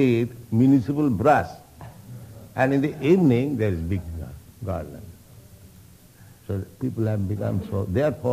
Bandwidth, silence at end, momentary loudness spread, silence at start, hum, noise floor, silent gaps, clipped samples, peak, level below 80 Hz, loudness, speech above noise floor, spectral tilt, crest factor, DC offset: 15.5 kHz; 0 s; 23 LU; 0 s; none; -49 dBFS; none; under 0.1%; -6 dBFS; -50 dBFS; -23 LUFS; 28 dB; -8.5 dB/octave; 18 dB; under 0.1%